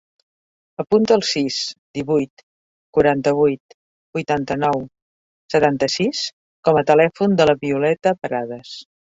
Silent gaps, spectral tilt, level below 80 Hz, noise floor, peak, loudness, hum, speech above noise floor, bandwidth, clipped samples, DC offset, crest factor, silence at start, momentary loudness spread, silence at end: 1.78-1.94 s, 2.30-2.37 s, 2.43-2.93 s, 3.60-4.13 s, 5.02-5.49 s, 6.33-6.63 s; -5 dB/octave; -54 dBFS; under -90 dBFS; -2 dBFS; -19 LUFS; none; over 72 dB; 8 kHz; under 0.1%; under 0.1%; 18 dB; 0.8 s; 14 LU; 0.2 s